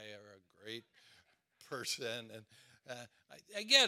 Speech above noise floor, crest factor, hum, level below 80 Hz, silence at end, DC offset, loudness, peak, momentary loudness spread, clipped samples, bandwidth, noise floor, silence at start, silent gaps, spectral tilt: 34 dB; 26 dB; none; under -90 dBFS; 0 s; under 0.1%; -40 LUFS; -12 dBFS; 18 LU; under 0.1%; 16 kHz; -70 dBFS; 0 s; none; -0.5 dB/octave